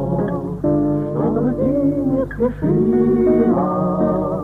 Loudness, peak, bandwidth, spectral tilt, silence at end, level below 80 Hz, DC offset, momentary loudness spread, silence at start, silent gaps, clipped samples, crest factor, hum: -18 LUFS; -4 dBFS; 3.9 kHz; -11.5 dB/octave; 0 s; -38 dBFS; under 0.1%; 6 LU; 0 s; none; under 0.1%; 12 dB; 50 Hz at -35 dBFS